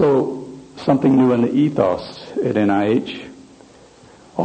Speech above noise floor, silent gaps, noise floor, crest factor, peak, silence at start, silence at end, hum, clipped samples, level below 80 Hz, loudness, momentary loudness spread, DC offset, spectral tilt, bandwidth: 29 dB; none; -46 dBFS; 16 dB; -2 dBFS; 0 s; 0 s; none; under 0.1%; -56 dBFS; -18 LUFS; 17 LU; under 0.1%; -8 dB/octave; 8.8 kHz